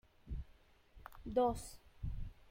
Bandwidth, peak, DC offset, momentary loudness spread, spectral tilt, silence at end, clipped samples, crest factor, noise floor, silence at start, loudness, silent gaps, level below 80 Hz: 16.5 kHz; -22 dBFS; under 0.1%; 23 LU; -6.5 dB/octave; 0.05 s; under 0.1%; 20 dB; -65 dBFS; 0.25 s; -41 LUFS; none; -50 dBFS